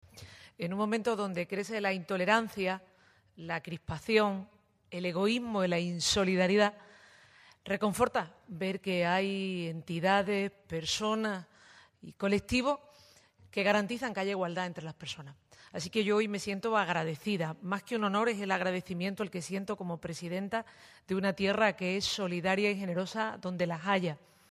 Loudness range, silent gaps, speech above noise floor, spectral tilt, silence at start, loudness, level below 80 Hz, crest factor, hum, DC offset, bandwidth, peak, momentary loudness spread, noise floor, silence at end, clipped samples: 3 LU; none; 29 dB; -4.5 dB/octave; 0.15 s; -32 LUFS; -64 dBFS; 22 dB; none; under 0.1%; 15 kHz; -12 dBFS; 11 LU; -61 dBFS; 0.35 s; under 0.1%